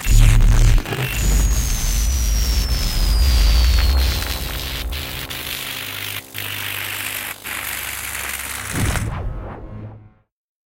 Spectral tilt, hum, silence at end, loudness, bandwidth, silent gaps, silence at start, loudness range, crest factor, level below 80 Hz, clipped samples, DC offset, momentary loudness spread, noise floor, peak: -3.5 dB/octave; none; 0.65 s; -21 LUFS; 17 kHz; none; 0 s; 6 LU; 18 dB; -20 dBFS; under 0.1%; under 0.1%; 10 LU; -43 dBFS; 0 dBFS